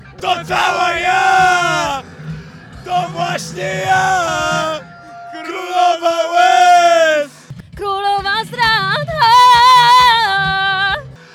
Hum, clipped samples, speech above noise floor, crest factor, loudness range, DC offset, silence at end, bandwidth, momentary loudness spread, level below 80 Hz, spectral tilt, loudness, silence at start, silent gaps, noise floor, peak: none; under 0.1%; 20 dB; 12 dB; 8 LU; under 0.1%; 0.2 s; 19 kHz; 18 LU; -44 dBFS; -2.5 dB/octave; -12 LUFS; 0.05 s; none; -34 dBFS; 0 dBFS